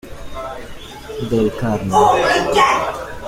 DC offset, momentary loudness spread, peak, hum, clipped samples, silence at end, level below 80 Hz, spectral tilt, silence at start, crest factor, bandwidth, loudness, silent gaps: under 0.1%; 19 LU; -2 dBFS; none; under 0.1%; 0 s; -38 dBFS; -4.5 dB/octave; 0.05 s; 16 dB; 16.5 kHz; -16 LUFS; none